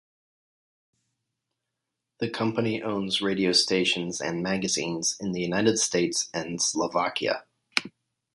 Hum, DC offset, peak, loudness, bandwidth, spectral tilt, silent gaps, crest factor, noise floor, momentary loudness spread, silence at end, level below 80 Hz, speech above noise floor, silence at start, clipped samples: none; under 0.1%; -2 dBFS; -26 LUFS; 11.5 kHz; -3 dB/octave; none; 26 dB; -84 dBFS; 8 LU; 0.45 s; -64 dBFS; 58 dB; 2.2 s; under 0.1%